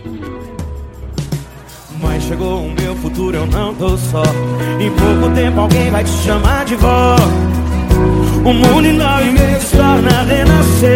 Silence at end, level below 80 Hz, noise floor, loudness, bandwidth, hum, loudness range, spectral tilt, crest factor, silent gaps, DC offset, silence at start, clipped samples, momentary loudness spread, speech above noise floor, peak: 0 s; -20 dBFS; -33 dBFS; -12 LUFS; 17 kHz; none; 8 LU; -6 dB/octave; 12 dB; none; under 0.1%; 0 s; under 0.1%; 16 LU; 22 dB; 0 dBFS